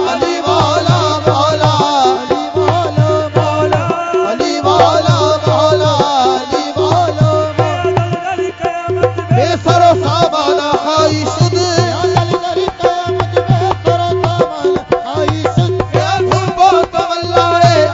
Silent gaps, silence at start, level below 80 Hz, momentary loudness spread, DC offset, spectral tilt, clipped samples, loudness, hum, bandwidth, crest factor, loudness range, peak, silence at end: none; 0 s; -40 dBFS; 6 LU; under 0.1%; -5.5 dB/octave; under 0.1%; -12 LUFS; none; 7.8 kHz; 12 dB; 2 LU; 0 dBFS; 0 s